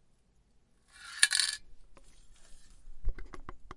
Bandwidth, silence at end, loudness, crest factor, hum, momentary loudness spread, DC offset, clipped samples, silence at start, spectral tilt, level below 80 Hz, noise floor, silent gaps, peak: 11.5 kHz; 0 s; -28 LUFS; 30 dB; none; 25 LU; under 0.1%; under 0.1%; 0.95 s; 1 dB/octave; -44 dBFS; -67 dBFS; none; -6 dBFS